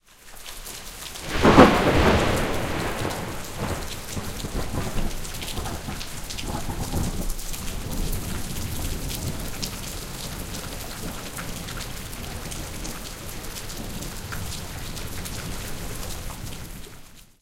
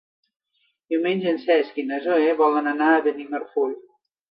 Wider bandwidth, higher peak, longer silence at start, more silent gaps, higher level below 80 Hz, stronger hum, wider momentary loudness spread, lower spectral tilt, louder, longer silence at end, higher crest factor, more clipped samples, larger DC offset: first, 17 kHz vs 5.6 kHz; first, 0 dBFS vs -6 dBFS; second, 0.1 s vs 0.9 s; neither; first, -34 dBFS vs -80 dBFS; neither; first, 15 LU vs 9 LU; second, -4.5 dB/octave vs -8.5 dB/octave; second, -27 LUFS vs -22 LUFS; second, 0.2 s vs 0.5 s; first, 26 dB vs 18 dB; neither; neither